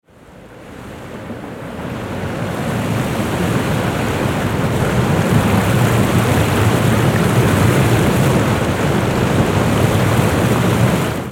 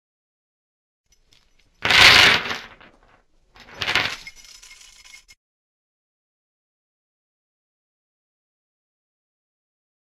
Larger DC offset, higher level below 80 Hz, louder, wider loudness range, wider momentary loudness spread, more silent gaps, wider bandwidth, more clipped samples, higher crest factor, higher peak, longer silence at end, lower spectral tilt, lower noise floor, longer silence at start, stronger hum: neither; first, -32 dBFS vs -50 dBFS; about the same, -16 LUFS vs -14 LUFS; second, 7 LU vs 13 LU; second, 14 LU vs 21 LU; neither; about the same, 17 kHz vs 16 kHz; neither; second, 14 dB vs 24 dB; about the same, -2 dBFS vs 0 dBFS; second, 0 s vs 6 s; first, -6 dB/octave vs -1 dB/octave; second, -40 dBFS vs -59 dBFS; second, 0.3 s vs 1.8 s; neither